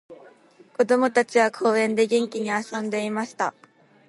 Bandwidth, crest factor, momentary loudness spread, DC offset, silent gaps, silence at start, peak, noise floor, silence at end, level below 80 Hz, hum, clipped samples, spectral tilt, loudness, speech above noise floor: 11.5 kHz; 18 dB; 9 LU; under 0.1%; none; 0.1 s; -6 dBFS; -52 dBFS; 0.6 s; -76 dBFS; none; under 0.1%; -4.5 dB/octave; -23 LUFS; 30 dB